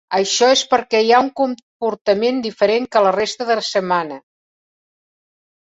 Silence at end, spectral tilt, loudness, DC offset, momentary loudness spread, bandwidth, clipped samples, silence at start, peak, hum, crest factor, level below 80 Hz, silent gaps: 1.5 s; -3 dB/octave; -17 LUFS; under 0.1%; 8 LU; 8 kHz; under 0.1%; 0.1 s; -2 dBFS; none; 16 dB; -62 dBFS; 1.62-1.80 s, 2.01-2.05 s